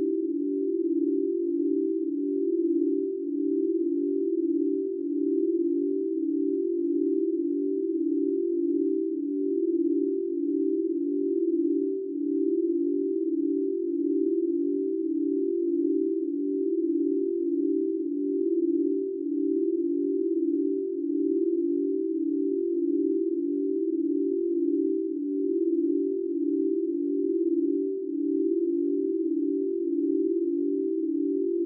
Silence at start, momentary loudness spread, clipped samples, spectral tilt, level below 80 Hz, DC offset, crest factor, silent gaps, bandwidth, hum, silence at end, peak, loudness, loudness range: 0 s; 3 LU; under 0.1%; -9 dB/octave; under -90 dBFS; under 0.1%; 10 dB; none; 0.5 kHz; none; 0 s; -16 dBFS; -27 LUFS; 0 LU